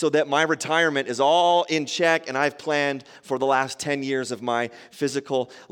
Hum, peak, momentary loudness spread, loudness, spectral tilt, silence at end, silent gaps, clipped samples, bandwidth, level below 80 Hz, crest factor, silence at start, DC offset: none; -6 dBFS; 8 LU; -23 LUFS; -3.5 dB/octave; 0.1 s; none; under 0.1%; 17 kHz; -74 dBFS; 18 dB; 0 s; under 0.1%